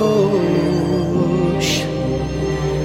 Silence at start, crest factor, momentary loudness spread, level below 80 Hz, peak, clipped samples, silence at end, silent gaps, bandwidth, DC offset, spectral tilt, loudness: 0 s; 12 dB; 5 LU; -34 dBFS; -4 dBFS; under 0.1%; 0 s; none; 16.5 kHz; under 0.1%; -6 dB/octave; -18 LUFS